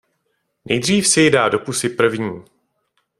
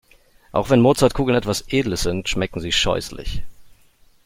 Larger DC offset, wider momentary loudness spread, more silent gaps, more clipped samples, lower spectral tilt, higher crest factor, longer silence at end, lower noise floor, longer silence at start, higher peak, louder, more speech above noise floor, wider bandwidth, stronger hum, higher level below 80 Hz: neither; about the same, 13 LU vs 14 LU; neither; neither; second, -3.5 dB/octave vs -5 dB/octave; about the same, 18 dB vs 18 dB; first, 0.8 s vs 0.6 s; first, -70 dBFS vs -54 dBFS; about the same, 0.65 s vs 0.55 s; about the same, 0 dBFS vs -2 dBFS; first, -17 LUFS vs -20 LUFS; first, 53 dB vs 34 dB; about the same, 15.5 kHz vs 16.5 kHz; neither; second, -56 dBFS vs -36 dBFS